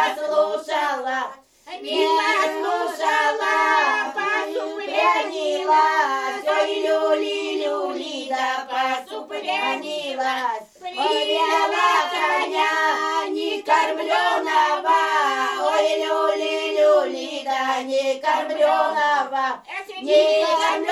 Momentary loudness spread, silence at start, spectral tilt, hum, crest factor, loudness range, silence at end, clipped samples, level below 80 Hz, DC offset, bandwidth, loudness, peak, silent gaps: 8 LU; 0 s; -1 dB/octave; none; 16 dB; 4 LU; 0 s; under 0.1%; -72 dBFS; under 0.1%; 13 kHz; -21 LUFS; -6 dBFS; none